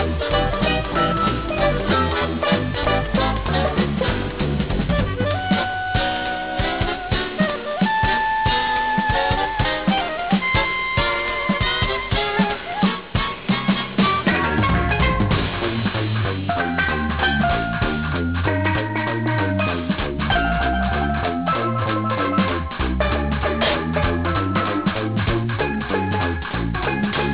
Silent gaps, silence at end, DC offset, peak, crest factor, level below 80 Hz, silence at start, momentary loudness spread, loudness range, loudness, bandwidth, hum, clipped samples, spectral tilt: none; 0 s; 0.5%; -6 dBFS; 14 dB; -30 dBFS; 0 s; 4 LU; 2 LU; -21 LUFS; 4 kHz; none; under 0.1%; -9.5 dB/octave